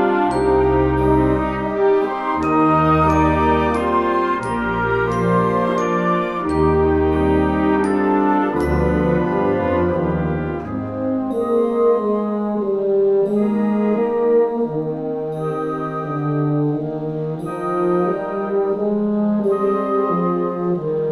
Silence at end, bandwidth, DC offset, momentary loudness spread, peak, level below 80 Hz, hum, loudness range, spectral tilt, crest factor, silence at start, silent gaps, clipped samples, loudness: 0 s; 11.5 kHz; under 0.1%; 7 LU; -4 dBFS; -34 dBFS; none; 4 LU; -8.5 dB/octave; 14 dB; 0 s; none; under 0.1%; -18 LUFS